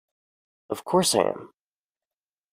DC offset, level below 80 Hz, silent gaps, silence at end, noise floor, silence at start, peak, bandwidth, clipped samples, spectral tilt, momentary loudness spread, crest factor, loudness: under 0.1%; -68 dBFS; none; 1.05 s; under -90 dBFS; 0.7 s; -6 dBFS; 15.5 kHz; under 0.1%; -3.5 dB/octave; 15 LU; 24 dB; -23 LUFS